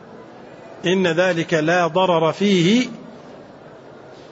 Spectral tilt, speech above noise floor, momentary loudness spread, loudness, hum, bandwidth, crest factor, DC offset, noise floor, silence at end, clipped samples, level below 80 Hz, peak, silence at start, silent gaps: -5.5 dB/octave; 24 dB; 15 LU; -18 LUFS; none; 8 kHz; 16 dB; under 0.1%; -41 dBFS; 0.1 s; under 0.1%; -64 dBFS; -6 dBFS; 0.05 s; none